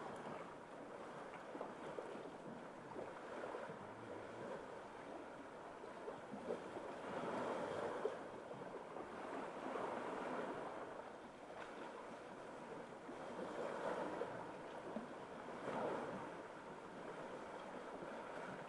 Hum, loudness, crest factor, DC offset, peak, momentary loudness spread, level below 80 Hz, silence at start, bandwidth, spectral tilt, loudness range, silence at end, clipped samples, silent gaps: none; -50 LUFS; 20 dB; under 0.1%; -28 dBFS; 9 LU; -80 dBFS; 0 s; 11.5 kHz; -5.5 dB/octave; 4 LU; 0 s; under 0.1%; none